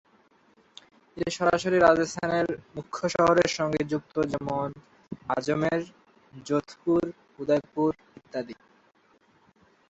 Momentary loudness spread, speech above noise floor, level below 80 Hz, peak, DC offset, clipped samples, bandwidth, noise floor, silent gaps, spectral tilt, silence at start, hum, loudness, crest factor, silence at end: 16 LU; 37 dB; -60 dBFS; -6 dBFS; under 0.1%; under 0.1%; 8.2 kHz; -63 dBFS; none; -5.5 dB/octave; 1.15 s; none; -27 LUFS; 22 dB; 1.35 s